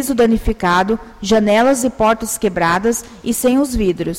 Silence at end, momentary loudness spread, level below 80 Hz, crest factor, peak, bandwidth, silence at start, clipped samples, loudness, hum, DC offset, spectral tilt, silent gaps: 0 s; 7 LU; -32 dBFS; 12 dB; -4 dBFS; 16.5 kHz; 0 s; under 0.1%; -16 LUFS; none; under 0.1%; -4.5 dB/octave; none